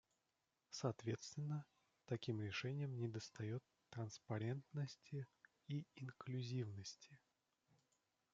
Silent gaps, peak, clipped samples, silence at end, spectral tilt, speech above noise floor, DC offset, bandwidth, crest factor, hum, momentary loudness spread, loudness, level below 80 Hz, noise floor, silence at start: none; -28 dBFS; under 0.1%; 1.15 s; -6 dB/octave; 41 dB; under 0.1%; 7.8 kHz; 20 dB; none; 10 LU; -49 LUFS; -86 dBFS; -89 dBFS; 0.7 s